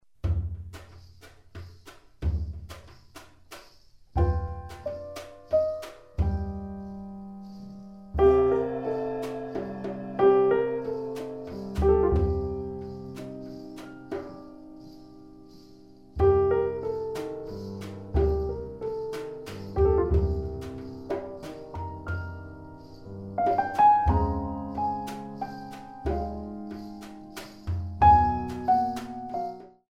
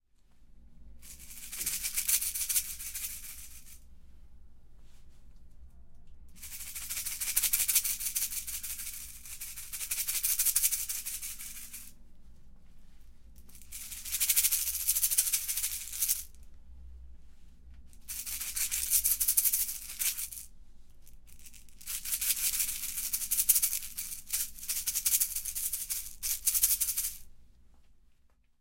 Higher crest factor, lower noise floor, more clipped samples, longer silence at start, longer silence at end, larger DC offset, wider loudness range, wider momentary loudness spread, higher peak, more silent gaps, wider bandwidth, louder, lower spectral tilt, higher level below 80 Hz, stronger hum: second, 20 dB vs 30 dB; second, -56 dBFS vs -64 dBFS; neither; about the same, 0.25 s vs 0.35 s; second, 0.2 s vs 0.5 s; first, 0.1% vs under 0.1%; first, 10 LU vs 7 LU; first, 22 LU vs 18 LU; about the same, -8 dBFS vs -6 dBFS; neither; second, 13 kHz vs 17 kHz; about the same, -28 LUFS vs -29 LUFS; first, -8.5 dB/octave vs 2 dB/octave; first, -38 dBFS vs -54 dBFS; neither